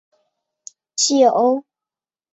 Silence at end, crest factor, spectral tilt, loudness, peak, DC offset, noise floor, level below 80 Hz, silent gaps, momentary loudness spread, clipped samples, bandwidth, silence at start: 0.75 s; 18 dB; -2 dB/octave; -16 LUFS; -4 dBFS; under 0.1%; under -90 dBFS; -70 dBFS; none; 12 LU; under 0.1%; 8 kHz; 0.95 s